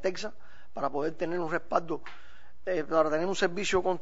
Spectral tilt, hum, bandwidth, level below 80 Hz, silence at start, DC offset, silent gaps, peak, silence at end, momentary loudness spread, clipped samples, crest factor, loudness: -4.5 dB/octave; none; 8 kHz; -58 dBFS; 0 s; 2%; none; -10 dBFS; 0.05 s; 14 LU; under 0.1%; 20 dB; -30 LUFS